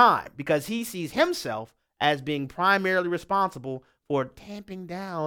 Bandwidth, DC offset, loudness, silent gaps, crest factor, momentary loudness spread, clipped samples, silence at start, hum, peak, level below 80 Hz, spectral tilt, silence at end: 18.5 kHz; under 0.1%; -26 LUFS; none; 22 dB; 15 LU; under 0.1%; 0 s; none; -4 dBFS; -62 dBFS; -4.5 dB/octave; 0 s